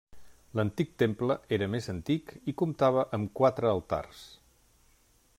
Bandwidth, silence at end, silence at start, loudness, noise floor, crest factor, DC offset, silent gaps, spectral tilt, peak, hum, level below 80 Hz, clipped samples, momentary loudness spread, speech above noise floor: 16 kHz; 1.05 s; 0.15 s; -30 LUFS; -65 dBFS; 20 dB; under 0.1%; none; -7.5 dB/octave; -12 dBFS; none; -60 dBFS; under 0.1%; 9 LU; 35 dB